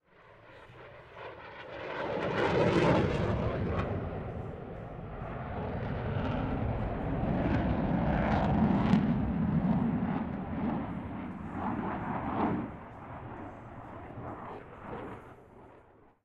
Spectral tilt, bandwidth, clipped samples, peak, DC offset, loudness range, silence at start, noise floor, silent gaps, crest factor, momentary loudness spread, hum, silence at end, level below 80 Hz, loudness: -8.5 dB/octave; 8.8 kHz; under 0.1%; -12 dBFS; under 0.1%; 9 LU; 0.25 s; -59 dBFS; none; 20 dB; 18 LU; none; 0.45 s; -44 dBFS; -32 LUFS